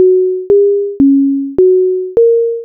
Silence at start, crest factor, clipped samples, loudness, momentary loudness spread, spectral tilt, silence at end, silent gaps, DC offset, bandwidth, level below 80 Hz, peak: 0 s; 8 dB; under 0.1%; -10 LUFS; 3 LU; -12.5 dB/octave; 0 s; none; under 0.1%; 1.6 kHz; -46 dBFS; -2 dBFS